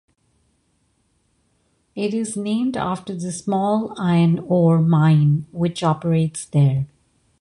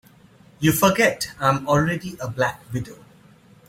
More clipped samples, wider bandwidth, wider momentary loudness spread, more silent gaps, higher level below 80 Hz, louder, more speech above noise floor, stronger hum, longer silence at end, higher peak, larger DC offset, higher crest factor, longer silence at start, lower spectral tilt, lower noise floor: neither; second, 11.5 kHz vs 16.5 kHz; second, 11 LU vs 14 LU; neither; about the same, -54 dBFS vs -50 dBFS; about the same, -20 LUFS vs -21 LUFS; first, 47 dB vs 30 dB; neither; second, 0.55 s vs 0.75 s; second, -6 dBFS vs -2 dBFS; neither; second, 14 dB vs 20 dB; first, 1.95 s vs 0.6 s; first, -7.5 dB/octave vs -5 dB/octave; first, -65 dBFS vs -51 dBFS